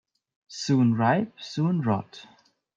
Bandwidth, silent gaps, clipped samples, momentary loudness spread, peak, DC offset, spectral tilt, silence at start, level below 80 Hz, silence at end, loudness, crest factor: 7.8 kHz; none; under 0.1%; 14 LU; -10 dBFS; under 0.1%; -6.5 dB/octave; 0.5 s; -68 dBFS; 0.55 s; -25 LUFS; 16 dB